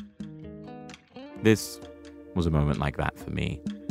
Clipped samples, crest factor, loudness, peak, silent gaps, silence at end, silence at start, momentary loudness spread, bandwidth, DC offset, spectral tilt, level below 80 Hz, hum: under 0.1%; 22 dB; -28 LUFS; -8 dBFS; none; 0 s; 0 s; 21 LU; 16 kHz; under 0.1%; -6 dB/octave; -42 dBFS; none